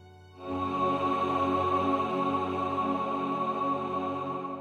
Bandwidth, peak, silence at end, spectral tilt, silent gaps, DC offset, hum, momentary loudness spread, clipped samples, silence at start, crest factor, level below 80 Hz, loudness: 9.2 kHz; -16 dBFS; 0 s; -7 dB/octave; none; under 0.1%; none; 7 LU; under 0.1%; 0 s; 14 dB; -64 dBFS; -29 LUFS